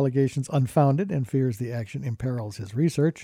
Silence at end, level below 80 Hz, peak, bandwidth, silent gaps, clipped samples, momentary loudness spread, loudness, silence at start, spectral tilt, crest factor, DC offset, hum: 0 s; -58 dBFS; -8 dBFS; 13.5 kHz; none; under 0.1%; 10 LU; -26 LUFS; 0 s; -8 dB/octave; 16 dB; under 0.1%; none